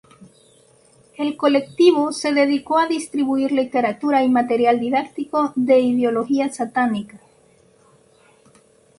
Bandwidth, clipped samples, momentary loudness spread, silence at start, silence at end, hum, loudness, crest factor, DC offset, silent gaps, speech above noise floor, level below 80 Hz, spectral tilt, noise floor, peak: 11.5 kHz; under 0.1%; 7 LU; 1.2 s; 1.8 s; none; -19 LUFS; 18 dB; under 0.1%; none; 36 dB; -64 dBFS; -4.5 dB/octave; -55 dBFS; -2 dBFS